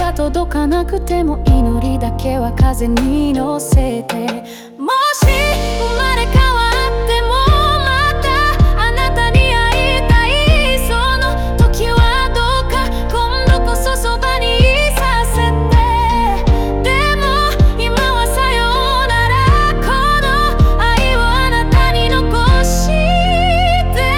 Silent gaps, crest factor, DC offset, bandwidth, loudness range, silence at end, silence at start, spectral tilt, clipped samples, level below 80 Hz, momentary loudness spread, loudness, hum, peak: none; 12 dB; under 0.1%; 17 kHz; 3 LU; 0 s; 0 s; -5 dB/octave; under 0.1%; -16 dBFS; 5 LU; -14 LUFS; none; 0 dBFS